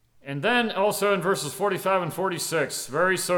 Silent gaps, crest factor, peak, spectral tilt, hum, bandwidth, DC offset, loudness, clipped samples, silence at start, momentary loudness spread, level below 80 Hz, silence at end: none; 16 dB; -10 dBFS; -3.5 dB/octave; none; over 20 kHz; under 0.1%; -24 LUFS; under 0.1%; 0.25 s; 5 LU; -66 dBFS; 0 s